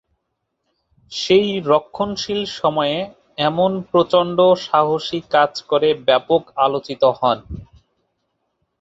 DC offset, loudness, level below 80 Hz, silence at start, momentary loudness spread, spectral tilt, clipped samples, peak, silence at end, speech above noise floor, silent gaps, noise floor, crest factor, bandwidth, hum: under 0.1%; -18 LUFS; -50 dBFS; 1.1 s; 9 LU; -5 dB/octave; under 0.1%; -2 dBFS; 1.15 s; 57 dB; none; -75 dBFS; 18 dB; 8 kHz; none